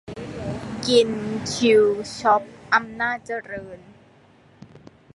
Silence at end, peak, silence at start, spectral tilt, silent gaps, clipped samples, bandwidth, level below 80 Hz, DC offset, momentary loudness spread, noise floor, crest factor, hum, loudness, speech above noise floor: 0.35 s; -4 dBFS; 0.05 s; -4 dB/octave; none; under 0.1%; 11.5 kHz; -54 dBFS; under 0.1%; 16 LU; -53 dBFS; 20 dB; none; -22 LUFS; 32 dB